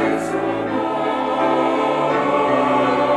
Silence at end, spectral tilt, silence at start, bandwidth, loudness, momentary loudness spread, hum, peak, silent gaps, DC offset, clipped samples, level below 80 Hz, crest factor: 0 s; -6 dB/octave; 0 s; 12.5 kHz; -19 LUFS; 5 LU; none; -4 dBFS; none; under 0.1%; under 0.1%; -54 dBFS; 14 dB